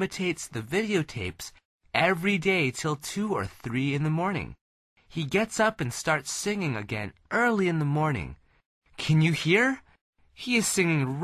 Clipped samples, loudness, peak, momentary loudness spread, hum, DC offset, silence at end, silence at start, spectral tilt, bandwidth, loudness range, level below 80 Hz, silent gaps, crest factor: under 0.1%; -27 LUFS; -8 dBFS; 12 LU; none; under 0.1%; 0 s; 0 s; -5 dB/octave; 13.5 kHz; 3 LU; -54 dBFS; 1.65-1.79 s, 4.61-4.96 s, 8.66-8.82 s, 10.01-10.13 s; 18 dB